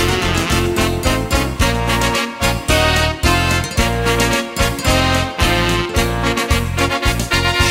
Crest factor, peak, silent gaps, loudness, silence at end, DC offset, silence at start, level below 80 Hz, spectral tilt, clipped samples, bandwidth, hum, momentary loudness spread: 16 dB; 0 dBFS; none; -16 LUFS; 0 s; under 0.1%; 0 s; -24 dBFS; -4 dB/octave; under 0.1%; 16.5 kHz; none; 3 LU